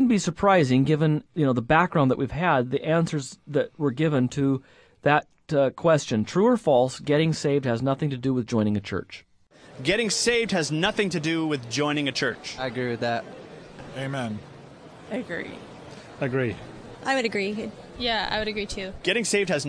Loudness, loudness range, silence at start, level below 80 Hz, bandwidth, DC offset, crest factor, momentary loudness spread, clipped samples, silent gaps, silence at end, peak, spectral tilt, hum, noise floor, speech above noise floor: -25 LUFS; 9 LU; 0 s; -52 dBFS; 11 kHz; under 0.1%; 20 dB; 13 LU; under 0.1%; none; 0 s; -6 dBFS; -5 dB/octave; none; -50 dBFS; 26 dB